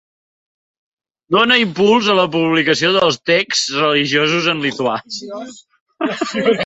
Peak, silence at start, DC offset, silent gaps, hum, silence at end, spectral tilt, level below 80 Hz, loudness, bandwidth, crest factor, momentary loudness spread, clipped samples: 0 dBFS; 1.3 s; under 0.1%; 5.80-5.86 s; none; 0 s; -3.5 dB/octave; -60 dBFS; -15 LUFS; 8.4 kHz; 16 dB; 12 LU; under 0.1%